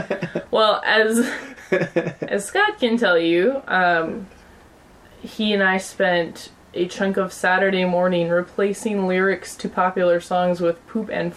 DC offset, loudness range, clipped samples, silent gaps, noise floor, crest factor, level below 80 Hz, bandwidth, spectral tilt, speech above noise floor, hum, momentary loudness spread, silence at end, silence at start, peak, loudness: under 0.1%; 3 LU; under 0.1%; none; -48 dBFS; 16 dB; -58 dBFS; 14.5 kHz; -5 dB/octave; 28 dB; none; 10 LU; 0 s; 0 s; -4 dBFS; -20 LUFS